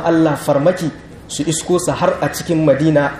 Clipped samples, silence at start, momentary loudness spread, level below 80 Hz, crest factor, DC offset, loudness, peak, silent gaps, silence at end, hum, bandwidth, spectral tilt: under 0.1%; 0 s; 10 LU; -44 dBFS; 14 dB; under 0.1%; -16 LUFS; -2 dBFS; none; 0 s; none; 15.5 kHz; -5.5 dB/octave